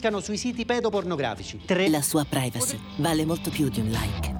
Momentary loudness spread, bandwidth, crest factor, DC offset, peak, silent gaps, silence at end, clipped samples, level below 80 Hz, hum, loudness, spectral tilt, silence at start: 6 LU; over 20 kHz; 16 dB; under 0.1%; -10 dBFS; none; 0 s; under 0.1%; -44 dBFS; none; -26 LUFS; -4.5 dB/octave; 0 s